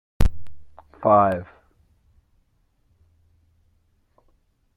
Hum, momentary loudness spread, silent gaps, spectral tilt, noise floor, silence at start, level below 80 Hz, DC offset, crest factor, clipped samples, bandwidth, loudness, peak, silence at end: none; 14 LU; none; -8 dB/octave; -65 dBFS; 0.2 s; -34 dBFS; under 0.1%; 20 dB; under 0.1%; 16 kHz; -21 LUFS; -4 dBFS; 3.3 s